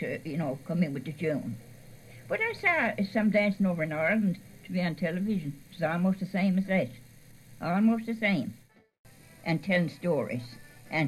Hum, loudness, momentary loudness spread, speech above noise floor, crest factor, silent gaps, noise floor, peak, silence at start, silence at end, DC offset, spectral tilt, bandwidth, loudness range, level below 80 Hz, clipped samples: none; -29 LUFS; 12 LU; 23 dB; 16 dB; 8.99-9.04 s; -52 dBFS; -14 dBFS; 0 s; 0 s; under 0.1%; -7.5 dB/octave; 13.5 kHz; 3 LU; -64 dBFS; under 0.1%